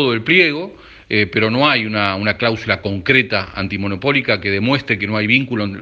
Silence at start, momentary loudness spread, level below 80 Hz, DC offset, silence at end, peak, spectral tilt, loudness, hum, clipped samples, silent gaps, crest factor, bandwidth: 0 s; 8 LU; -50 dBFS; under 0.1%; 0 s; 0 dBFS; -7 dB/octave; -16 LUFS; none; under 0.1%; none; 16 dB; 7.6 kHz